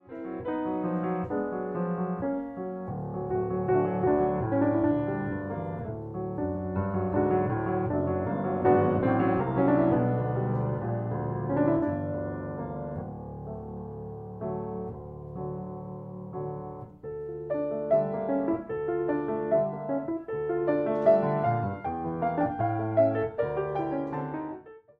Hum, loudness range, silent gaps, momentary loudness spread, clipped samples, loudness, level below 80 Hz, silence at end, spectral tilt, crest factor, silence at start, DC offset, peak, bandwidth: none; 11 LU; none; 14 LU; under 0.1%; -29 LUFS; -54 dBFS; 0.2 s; -11.5 dB/octave; 20 dB; 0.05 s; under 0.1%; -10 dBFS; 4.5 kHz